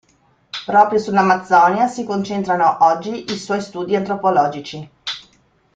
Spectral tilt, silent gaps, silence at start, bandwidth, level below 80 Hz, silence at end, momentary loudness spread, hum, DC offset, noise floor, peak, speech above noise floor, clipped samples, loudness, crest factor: -5 dB/octave; none; 0.55 s; 9 kHz; -60 dBFS; 0.55 s; 15 LU; none; under 0.1%; -58 dBFS; -2 dBFS; 41 dB; under 0.1%; -17 LUFS; 16 dB